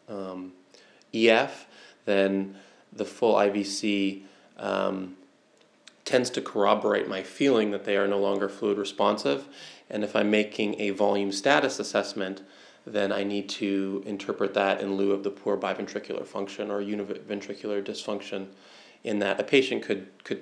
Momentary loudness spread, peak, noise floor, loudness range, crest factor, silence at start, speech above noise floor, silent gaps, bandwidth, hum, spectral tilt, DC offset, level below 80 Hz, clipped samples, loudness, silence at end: 14 LU; -4 dBFS; -61 dBFS; 5 LU; 24 dB; 0.1 s; 34 dB; none; 11 kHz; none; -4.5 dB/octave; under 0.1%; -90 dBFS; under 0.1%; -27 LUFS; 0 s